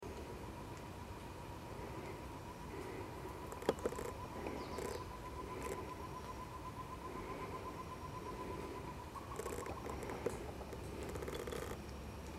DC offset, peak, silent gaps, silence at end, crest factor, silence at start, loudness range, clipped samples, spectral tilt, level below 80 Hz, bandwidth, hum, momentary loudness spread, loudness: under 0.1%; -18 dBFS; none; 0 s; 28 dB; 0 s; 3 LU; under 0.1%; -5.5 dB/octave; -56 dBFS; 16 kHz; none; 6 LU; -47 LUFS